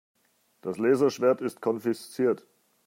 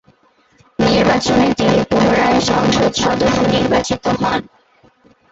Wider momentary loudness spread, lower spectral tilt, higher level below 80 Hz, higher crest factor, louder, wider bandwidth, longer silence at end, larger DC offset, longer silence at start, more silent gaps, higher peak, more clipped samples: first, 11 LU vs 5 LU; about the same, -6 dB/octave vs -5 dB/octave; second, -78 dBFS vs -38 dBFS; about the same, 18 dB vs 14 dB; second, -27 LUFS vs -14 LUFS; first, 16 kHz vs 8 kHz; second, 0.5 s vs 0.9 s; neither; second, 0.65 s vs 0.8 s; neither; second, -10 dBFS vs -2 dBFS; neither